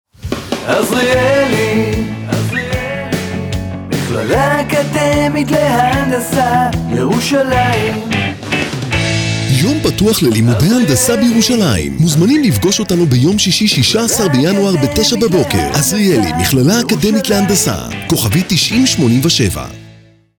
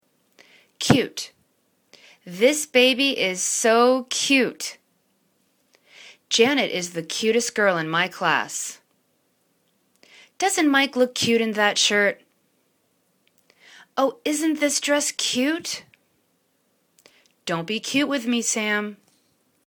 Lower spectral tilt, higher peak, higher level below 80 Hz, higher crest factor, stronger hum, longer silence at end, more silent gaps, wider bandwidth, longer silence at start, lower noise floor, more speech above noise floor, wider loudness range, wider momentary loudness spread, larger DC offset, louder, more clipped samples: first, -4.5 dB/octave vs -2.5 dB/octave; about the same, -2 dBFS vs 0 dBFS; first, -34 dBFS vs -66 dBFS; second, 12 dB vs 24 dB; neither; second, 0.5 s vs 0.75 s; neither; about the same, over 20 kHz vs 19 kHz; second, 0.25 s vs 0.8 s; second, -42 dBFS vs -68 dBFS; second, 30 dB vs 46 dB; about the same, 4 LU vs 6 LU; second, 8 LU vs 12 LU; neither; first, -12 LUFS vs -21 LUFS; neither